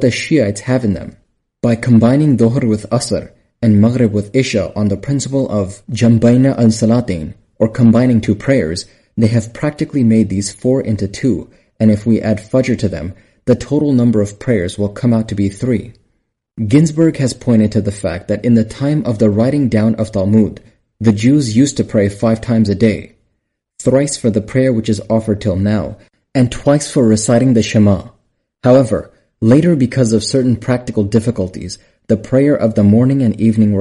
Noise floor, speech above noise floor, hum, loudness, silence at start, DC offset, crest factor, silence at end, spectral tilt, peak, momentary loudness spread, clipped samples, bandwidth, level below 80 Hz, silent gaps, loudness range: -69 dBFS; 57 dB; none; -14 LUFS; 0 s; under 0.1%; 12 dB; 0 s; -7 dB/octave; 0 dBFS; 9 LU; under 0.1%; 11.5 kHz; -42 dBFS; none; 3 LU